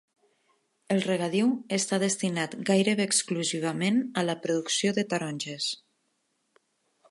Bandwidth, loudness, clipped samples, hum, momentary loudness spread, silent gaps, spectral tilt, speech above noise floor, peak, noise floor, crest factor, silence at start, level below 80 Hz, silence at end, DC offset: 11.5 kHz; -27 LUFS; under 0.1%; none; 6 LU; none; -4 dB/octave; 48 dB; -10 dBFS; -75 dBFS; 18 dB; 0.9 s; -78 dBFS; 1.35 s; under 0.1%